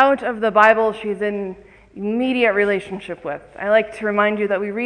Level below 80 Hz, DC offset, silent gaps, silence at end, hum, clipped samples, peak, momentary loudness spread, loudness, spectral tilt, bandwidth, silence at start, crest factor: -56 dBFS; under 0.1%; none; 0 s; none; under 0.1%; 0 dBFS; 15 LU; -19 LUFS; -6 dB/octave; 10 kHz; 0 s; 18 dB